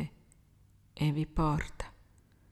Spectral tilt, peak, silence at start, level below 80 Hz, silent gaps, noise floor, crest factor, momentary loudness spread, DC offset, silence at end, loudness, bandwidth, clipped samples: -7 dB/octave; -18 dBFS; 0 s; -46 dBFS; none; -63 dBFS; 18 dB; 16 LU; under 0.1%; 0.6 s; -33 LUFS; 12 kHz; under 0.1%